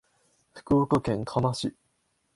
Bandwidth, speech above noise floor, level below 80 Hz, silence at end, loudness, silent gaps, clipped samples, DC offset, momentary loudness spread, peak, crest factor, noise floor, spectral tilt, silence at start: 11.5 kHz; 48 dB; -54 dBFS; 0.65 s; -27 LUFS; none; under 0.1%; under 0.1%; 9 LU; -10 dBFS; 20 dB; -73 dBFS; -7 dB/octave; 0.55 s